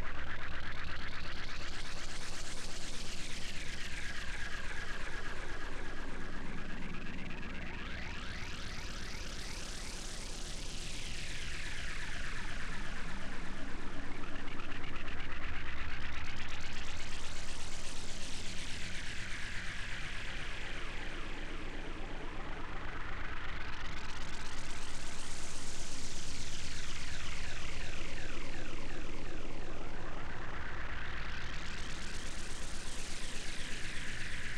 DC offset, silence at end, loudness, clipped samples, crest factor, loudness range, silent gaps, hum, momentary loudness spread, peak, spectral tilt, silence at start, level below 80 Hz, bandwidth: under 0.1%; 0 s; -43 LUFS; under 0.1%; 10 dB; 2 LU; none; none; 3 LU; -22 dBFS; -3 dB/octave; 0 s; -42 dBFS; 10.5 kHz